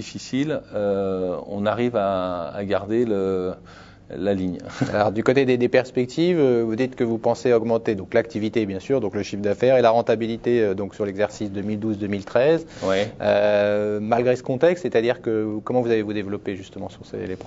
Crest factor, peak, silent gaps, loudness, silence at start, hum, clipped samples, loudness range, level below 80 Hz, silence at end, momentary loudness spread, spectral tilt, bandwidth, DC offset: 18 dB; -2 dBFS; none; -22 LUFS; 0 s; none; under 0.1%; 4 LU; -56 dBFS; 0 s; 9 LU; -6.5 dB/octave; 7.8 kHz; under 0.1%